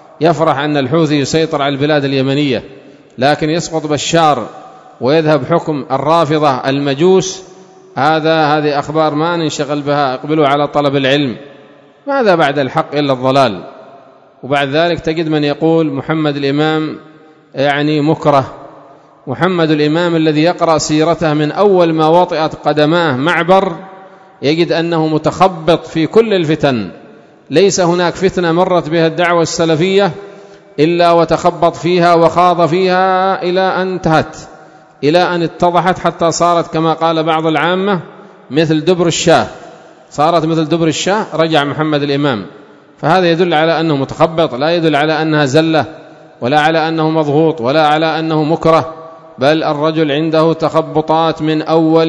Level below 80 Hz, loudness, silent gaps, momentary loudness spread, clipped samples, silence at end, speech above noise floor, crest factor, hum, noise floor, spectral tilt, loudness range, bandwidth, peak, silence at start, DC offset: -48 dBFS; -12 LUFS; none; 6 LU; 0.3%; 0 s; 29 dB; 12 dB; none; -41 dBFS; -5.5 dB/octave; 3 LU; 11 kHz; 0 dBFS; 0.2 s; under 0.1%